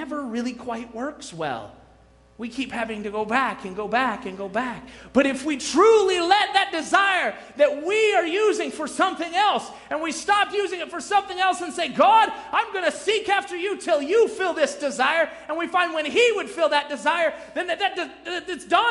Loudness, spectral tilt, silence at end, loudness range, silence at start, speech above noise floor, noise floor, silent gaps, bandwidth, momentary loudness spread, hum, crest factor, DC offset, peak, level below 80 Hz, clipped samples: -22 LUFS; -2.5 dB/octave; 0 s; 7 LU; 0 s; 31 dB; -54 dBFS; none; 11.5 kHz; 12 LU; none; 20 dB; under 0.1%; -4 dBFS; -60 dBFS; under 0.1%